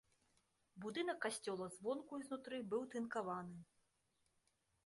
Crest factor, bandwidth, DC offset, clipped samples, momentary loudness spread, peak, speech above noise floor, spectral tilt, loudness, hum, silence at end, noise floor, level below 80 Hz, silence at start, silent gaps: 18 dB; 11.5 kHz; under 0.1%; under 0.1%; 6 LU; -30 dBFS; 38 dB; -4.5 dB/octave; -46 LUFS; none; 1.2 s; -83 dBFS; -86 dBFS; 0.75 s; none